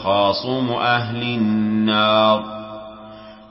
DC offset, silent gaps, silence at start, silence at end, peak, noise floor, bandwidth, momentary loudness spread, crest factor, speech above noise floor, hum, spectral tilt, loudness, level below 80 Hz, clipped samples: under 0.1%; none; 0 s; 0.05 s; -4 dBFS; -39 dBFS; 5.8 kHz; 20 LU; 16 dB; 21 dB; none; -10 dB/octave; -18 LUFS; -54 dBFS; under 0.1%